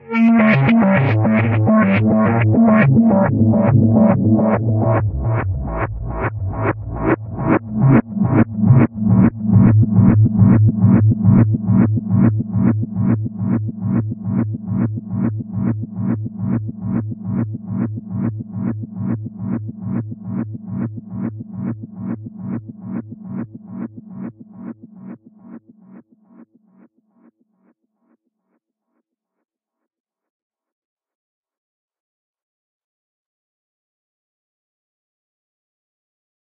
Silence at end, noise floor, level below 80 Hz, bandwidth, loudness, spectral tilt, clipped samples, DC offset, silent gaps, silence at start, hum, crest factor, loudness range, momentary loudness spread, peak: 10.5 s; -74 dBFS; -40 dBFS; 3.8 kHz; -17 LUFS; -9.5 dB/octave; under 0.1%; under 0.1%; none; 0.05 s; none; 16 dB; 16 LU; 16 LU; 0 dBFS